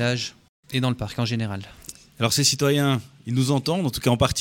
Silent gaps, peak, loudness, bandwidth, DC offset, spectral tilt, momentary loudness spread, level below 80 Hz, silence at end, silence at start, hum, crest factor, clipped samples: 0.49-0.63 s; -4 dBFS; -23 LUFS; 17 kHz; under 0.1%; -4.5 dB/octave; 14 LU; -48 dBFS; 0 s; 0 s; none; 20 dB; under 0.1%